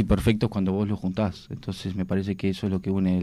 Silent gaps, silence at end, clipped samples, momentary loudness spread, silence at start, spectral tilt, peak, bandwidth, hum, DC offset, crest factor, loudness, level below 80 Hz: none; 0 s; under 0.1%; 9 LU; 0 s; -7.5 dB/octave; -10 dBFS; 13.5 kHz; none; under 0.1%; 16 dB; -27 LUFS; -42 dBFS